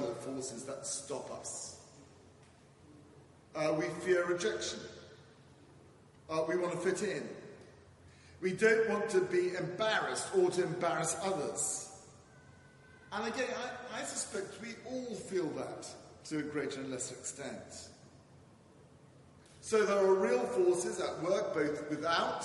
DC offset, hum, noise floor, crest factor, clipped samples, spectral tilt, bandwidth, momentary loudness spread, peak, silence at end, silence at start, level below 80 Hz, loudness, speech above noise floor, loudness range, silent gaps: under 0.1%; none; -61 dBFS; 22 dB; under 0.1%; -3.5 dB/octave; 11.5 kHz; 16 LU; -14 dBFS; 0 s; 0 s; -76 dBFS; -35 LUFS; 26 dB; 10 LU; none